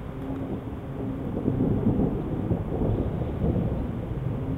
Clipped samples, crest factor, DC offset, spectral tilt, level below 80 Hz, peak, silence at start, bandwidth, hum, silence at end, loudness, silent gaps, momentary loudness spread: under 0.1%; 18 dB; under 0.1%; -10.5 dB/octave; -36 dBFS; -8 dBFS; 0 s; 4.1 kHz; none; 0 s; -28 LUFS; none; 9 LU